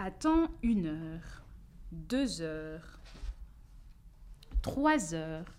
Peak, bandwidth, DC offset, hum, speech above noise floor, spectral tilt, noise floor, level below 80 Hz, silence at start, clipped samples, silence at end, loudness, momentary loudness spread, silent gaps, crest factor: -16 dBFS; 14.5 kHz; under 0.1%; none; 20 dB; -5.5 dB/octave; -53 dBFS; -44 dBFS; 0 s; under 0.1%; 0 s; -33 LUFS; 22 LU; none; 18 dB